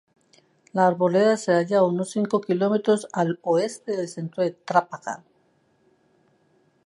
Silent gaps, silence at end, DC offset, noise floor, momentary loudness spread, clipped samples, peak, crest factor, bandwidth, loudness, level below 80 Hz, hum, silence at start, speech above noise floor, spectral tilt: none; 1.7 s; under 0.1%; -64 dBFS; 11 LU; under 0.1%; -4 dBFS; 20 dB; 11.5 kHz; -23 LUFS; -76 dBFS; none; 0.75 s; 42 dB; -6 dB/octave